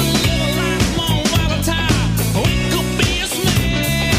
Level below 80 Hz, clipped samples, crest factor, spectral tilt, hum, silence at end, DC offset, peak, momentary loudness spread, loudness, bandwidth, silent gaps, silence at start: -26 dBFS; under 0.1%; 12 dB; -4.5 dB/octave; none; 0 s; under 0.1%; -4 dBFS; 1 LU; -17 LUFS; 16 kHz; none; 0 s